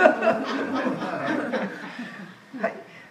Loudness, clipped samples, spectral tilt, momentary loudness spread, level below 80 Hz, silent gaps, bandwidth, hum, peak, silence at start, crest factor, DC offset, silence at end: -27 LUFS; under 0.1%; -5.5 dB/octave; 15 LU; -76 dBFS; none; 11.5 kHz; none; 0 dBFS; 0 s; 24 dB; under 0.1%; 0 s